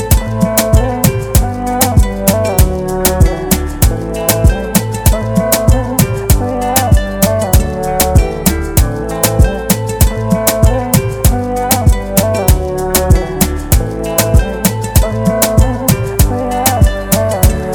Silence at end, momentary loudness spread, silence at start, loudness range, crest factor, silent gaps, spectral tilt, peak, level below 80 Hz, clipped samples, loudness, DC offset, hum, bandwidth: 0 s; 3 LU; 0 s; 1 LU; 12 dB; none; -5 dB/octave; 0 dBFS; -16 dBFS; 0.4%; -12 LUFS; under 0.1%; none; over 20 kHz